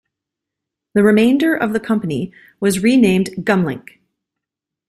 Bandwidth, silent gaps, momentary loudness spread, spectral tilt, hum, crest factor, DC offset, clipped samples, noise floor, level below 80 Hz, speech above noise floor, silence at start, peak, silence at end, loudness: 13.5 kHz; none; 11 LU; -6 dB/octave; none; 16 dB; under 0.1%; under 0.1%; -84 dBFS; -54 dBFS; 69 dB; 0.95 s; -2 dBFS; 1.1 s; -16 LUFS